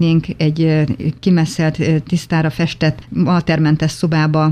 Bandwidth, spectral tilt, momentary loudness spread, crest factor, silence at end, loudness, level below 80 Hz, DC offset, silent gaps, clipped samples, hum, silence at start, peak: 11 kHz; -7 dB/octave; 4 LU; 14 dB; 0 s; -16 LUFS; -42 dBFS; under 0.1%; none; under 0.1%; none; 0 s; -2 dBFS